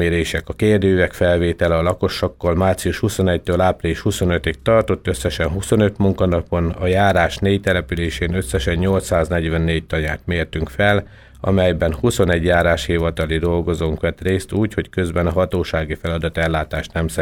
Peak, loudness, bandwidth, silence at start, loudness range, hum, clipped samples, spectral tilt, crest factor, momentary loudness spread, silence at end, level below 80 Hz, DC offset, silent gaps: -2 dBFS; -19 LUFS; 16.5 kHz; 0 s; 2 LU; none; under 0.1%; -6 dB/octave; 16 dB; 6 LU; 0 s; -32 dBFS; under 0.1%; none